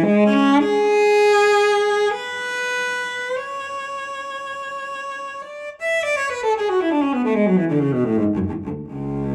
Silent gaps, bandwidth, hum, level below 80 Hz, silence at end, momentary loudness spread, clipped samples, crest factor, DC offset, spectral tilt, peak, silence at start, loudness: none; 12.5 kHz; none; -52 dBFS; 0 s; 14 LU; under 0.1%; 16 dB; under 0.1%; -5.5 dB/octave; -4 dBFS; 0 s; -20 LUFS